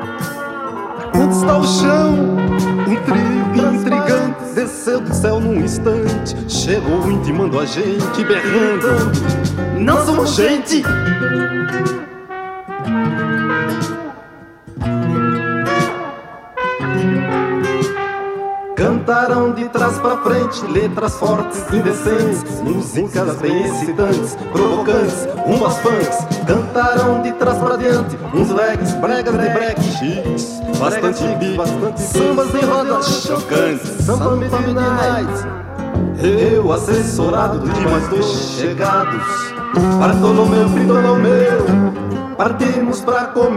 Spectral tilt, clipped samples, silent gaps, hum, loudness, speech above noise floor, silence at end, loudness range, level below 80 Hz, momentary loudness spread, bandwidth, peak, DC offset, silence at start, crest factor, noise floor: -6 dB/octave; under 0.1%; none; none; -16 LUFS; 23 dB; 0 s; 5 LU; -38 dBFS; 8 LU; 15.5 kHz; -2 dBFS; under 0.1%; 0 s; 12 dB; -38 dBFS